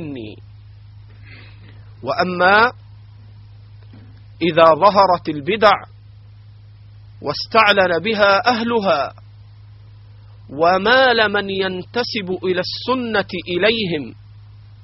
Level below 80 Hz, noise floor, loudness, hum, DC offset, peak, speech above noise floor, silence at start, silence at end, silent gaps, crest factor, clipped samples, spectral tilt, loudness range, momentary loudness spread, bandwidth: -50 dBFS; -42 dBFS; -16 LUFS; none; under 0.1%; 0 dBFS; 26 dB; 0 s; 0.25 s; none; 18 dB; under 0.1%; -2 dB/octave; 4 LU; 13 LU; 6 kHz